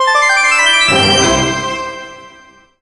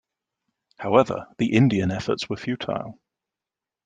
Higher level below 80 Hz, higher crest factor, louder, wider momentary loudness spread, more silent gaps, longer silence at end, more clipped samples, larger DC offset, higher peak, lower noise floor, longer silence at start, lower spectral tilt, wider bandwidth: first, -38 dBFS vs -58 dBFS; second, 14 dB vs 22 dB; first, -10 LUFS vs -23 LUFS; first, 16 LU vs 12 LU; neither; second, 0.5 s vs 0.95 s; neither; neither; about the same, 0 dBFS vs -2 dBFS; second, -43 dBFS vs -89 dBFS; second, 0 s vs 0.8 s; second, -2 dB/octave vs -7 dB/octave; first, 11.5 kHz vs 9.4 kHz